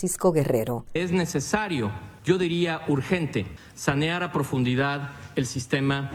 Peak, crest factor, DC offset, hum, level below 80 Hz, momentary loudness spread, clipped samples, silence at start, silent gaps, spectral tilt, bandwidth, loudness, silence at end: -6 dBFS; 20 dB; under 0.1%; none; -52 dBFS; 8 LU; under 0.1%; 0 s; none; -5.5 dB/octave; 19 kHz; -26 LUFS; 0 s